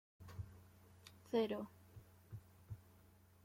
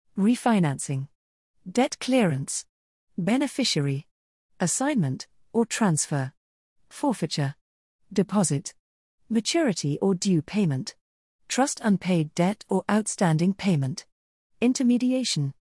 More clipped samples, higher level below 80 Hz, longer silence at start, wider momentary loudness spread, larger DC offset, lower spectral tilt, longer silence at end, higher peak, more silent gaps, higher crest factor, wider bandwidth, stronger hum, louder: neither; about the same, -72 dBFS vs -68 dBFS; about the same, 0.2 s vs 0.15 s; first, 24 LU vs 9 LU; neither; first, -6.5 dB/octave vs -5 dB/octave; first, 0.45 s vs 0.1 s; second, -26 dBFS vs -8 dBFS; second, none vs 1.15-1.54 s, 2.69-3.07 s, 4.11-4.49 s, 6.37-6.76 s, 7.61-7.99 s, 8.79-9.18 s, 11.01-11.39 s, 14.12-14.50 s; about the same, 22 dB vs 18 dB; first, 16.5 kHz vs 12 kHz; neither; second, -46 LUFS vs -25 LUFS